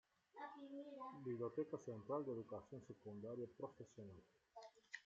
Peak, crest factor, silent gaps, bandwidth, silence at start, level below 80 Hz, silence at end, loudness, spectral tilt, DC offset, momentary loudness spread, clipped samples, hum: -34 dBFS; 18 dB; none; 7.6 kHz; 0.35 s; -88 dBFS; 0.05 s; -52 LUFS; -6.5 dB/octave; under 0.1%; 16 LU; under 0.1%; none